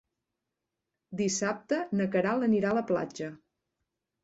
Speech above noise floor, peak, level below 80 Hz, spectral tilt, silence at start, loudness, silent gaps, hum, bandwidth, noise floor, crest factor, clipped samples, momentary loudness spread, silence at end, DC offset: 57 dB; -16 dBFS; -70 dBFS; -5 dB/octave; 1.1 s; -29 LUFS; none; none; 8.2 kHz; -86 dBFS; 16 dB; under 0.1%; 12 LU; 0.9 s; under 0.1%